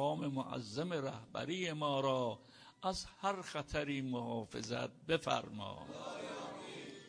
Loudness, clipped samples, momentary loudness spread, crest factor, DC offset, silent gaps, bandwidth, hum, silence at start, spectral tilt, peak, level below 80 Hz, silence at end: -40 LUFS; under 0.1%; 11 LU; 20 dB; under 0.1%; none; 10.5 kHz; none; 0 s; -5 dB/octave; -20 dBFS; -66 dBFS; 0 s